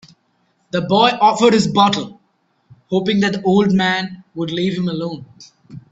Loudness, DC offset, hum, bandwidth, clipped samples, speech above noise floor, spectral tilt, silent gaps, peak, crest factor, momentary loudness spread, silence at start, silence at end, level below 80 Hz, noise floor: -16 LUFS; under 0.1%; none; 8.2 kHz; under 0.1%; 47 dB; -5.5 dB/octave; none; 0 dBFS; 18 dB; 13 LU; 0.75 s; 0.1 s; -56 dBFS; -63 dBFS